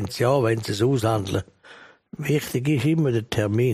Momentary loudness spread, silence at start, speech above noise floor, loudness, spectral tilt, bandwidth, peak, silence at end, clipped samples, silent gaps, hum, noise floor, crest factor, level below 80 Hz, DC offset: 9 LU; 0 s; 27 dB; -23 LUFS; -6.5 dB/octave; 15.5 kHz; -8 dBFS; 0 s; under 0.1%; none; none; -48 dBFS; 14 dB; -54 dBFS; under 0.1%